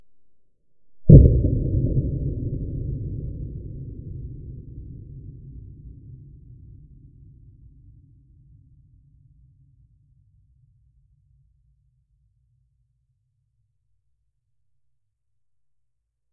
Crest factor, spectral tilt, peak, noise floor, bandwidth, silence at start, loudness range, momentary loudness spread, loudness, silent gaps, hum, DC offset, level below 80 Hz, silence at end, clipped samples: 24 dB; -17.5 dB/octave; 0 dBFS; -80 dBFS; 0.7 kHz; 0.95 s; 27 LU; 31 LU; -20 LUFS; none; none; under 0.1%; -30 dBFS; 10.15 s; under 0.1%